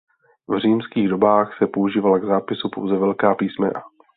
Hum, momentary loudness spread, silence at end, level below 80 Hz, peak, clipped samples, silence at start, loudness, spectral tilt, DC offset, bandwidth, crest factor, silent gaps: none; 8 LU; 0.3 s; -60 dBFS; -2 dBFS; under 0.1%; 0.5 s; -20 LUFS; -11 dB/octave; under 0.1%; 4.5 kHz; 18 dB; none